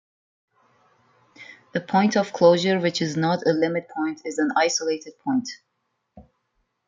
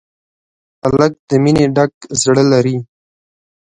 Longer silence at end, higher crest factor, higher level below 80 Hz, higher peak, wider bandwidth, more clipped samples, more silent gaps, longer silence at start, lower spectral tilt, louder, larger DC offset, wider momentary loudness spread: second, 0.65 s vs 0.85 s; about the same, 20 dB vs 16 dB; second, -68 dBFS vs -46 dBFS; second, -4 dBFS vs 0 dBFS; second, 8.8 kHz vs 10.5 kHz; neither; second, none vs 1.19-1.28 s, 1.94-2.01 s; first, 1.4 s vs 0.85 s; about the same, -4.5 dB/octave vs -5.5 dB/octave; second, -22 LUFS vs -14 LUFS; neither; first, 11 LU vs 7 LU